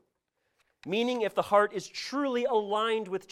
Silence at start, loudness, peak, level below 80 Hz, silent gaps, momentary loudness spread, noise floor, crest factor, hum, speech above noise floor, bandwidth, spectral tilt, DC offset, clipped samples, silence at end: 0.85 s; -29 LUFS; -12 dBFS; -74 dBFS; none; 9 LU; -79 dBFS; 18 dB; none; 50 dB; 14.5 kHz; -4 dB/octave; under 0.1%; under 0.1%; 0.1 s